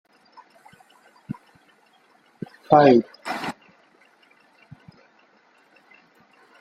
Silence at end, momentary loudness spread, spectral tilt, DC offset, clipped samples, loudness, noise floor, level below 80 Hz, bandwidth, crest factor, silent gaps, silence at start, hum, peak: 3.1 s; 26 LU; -7 dB/octave; under 0.1%; under 0.1%; -19 LUFS; -59 dBFS; -68 dBFS; 14.5 kHz; 26 dB; none; 1.3 s; none; 0 dBFS